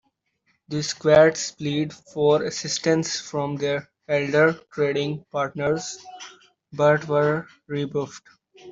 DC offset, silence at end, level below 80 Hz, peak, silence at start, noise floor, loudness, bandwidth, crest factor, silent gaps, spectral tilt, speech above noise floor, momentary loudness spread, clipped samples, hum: under 0.1%; 0 s; -62 dBFS; -4 dBFS; 0.7 s; -70 dBFS; -23 LUFS; 7.8 kHz; 20 dB; none; -4.5 dB/octave; 47 dB; 13 LU; under 0.1%; none